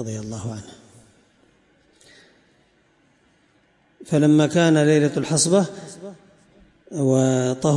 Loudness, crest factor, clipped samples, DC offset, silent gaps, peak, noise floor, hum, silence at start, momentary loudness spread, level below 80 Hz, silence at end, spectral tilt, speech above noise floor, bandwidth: -19 LUFS; 16 dB; under 0.1%; under 0.1%; none; -6 dBFS; -61 dBFS; none; 0 s; 21 LU; -62 dBFS; 0 s; -5.5 dB/octave; 41 dB; 11.5 kHz